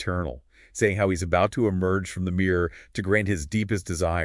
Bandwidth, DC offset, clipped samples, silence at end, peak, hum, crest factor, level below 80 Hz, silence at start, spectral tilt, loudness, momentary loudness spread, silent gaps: 12 kHz; under 0.1%; under 0.1%; 0 s; -8 dBFS; none; 18 dB; -46 dBFS; 0 s; -6 dB/octave; -25 LUFS; 8 LU; none